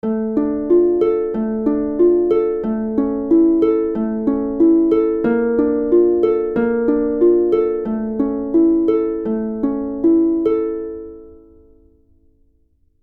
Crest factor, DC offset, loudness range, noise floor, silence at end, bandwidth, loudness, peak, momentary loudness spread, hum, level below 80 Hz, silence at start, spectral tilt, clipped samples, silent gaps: 12 dB; under 0.1%; 5 LU; -58 dBFS; 1.7 s; 3.3 kHz; -17 LUFS; -4 dBFS; 7 LU; none; -46 dBFS; 0.05 s; -10.5 dB/octave; under 0.1%; none